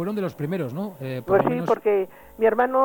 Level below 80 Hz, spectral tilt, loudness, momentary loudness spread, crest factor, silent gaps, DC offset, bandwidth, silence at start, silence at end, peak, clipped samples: -58 dBFS; -8 dB/octave; -24 LUFS; 10 LU; 14 dB; none; under 0.1%; 17.5 kHz; 0 s; 0 s; -8 dBFS; under 0.1%